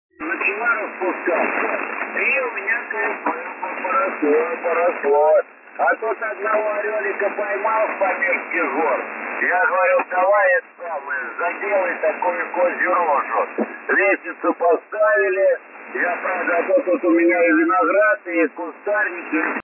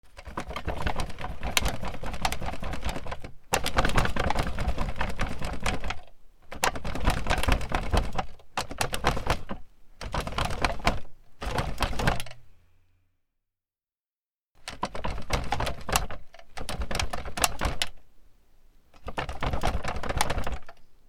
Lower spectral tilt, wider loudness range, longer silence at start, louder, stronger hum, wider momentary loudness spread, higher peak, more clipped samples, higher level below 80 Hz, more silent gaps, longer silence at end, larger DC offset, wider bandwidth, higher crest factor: first, -7.5 dB/octave vs -3.5 dB/octave; about the same, 3 LU vs 5 LU; first, 0.2 s vs 0.05 s; first, -19 LUFS vs -31 LUFS; neither; second, 8 LU vs 12 LU; second, -8 dBFS vs 0 dBFS; neither; second, -82 dBFS vs -36 dBFS; second, none vs 14.00-14.49 s; about the same, 0 s vs 0.1 s; neither; second, 2.9 kHz vs 17 kHz; second, 12 dB vs 28 dB